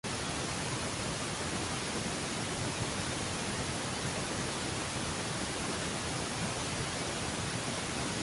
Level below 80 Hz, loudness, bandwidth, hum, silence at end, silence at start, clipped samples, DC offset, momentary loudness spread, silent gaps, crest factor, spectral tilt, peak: -52 dBFS; -35 LUFS; 12 kHz; none; 0 s; 0.05 s; under 0.1%; under 0.1%; 0 LU; none; 14 dB; -3 dB/octave; -22 dBFS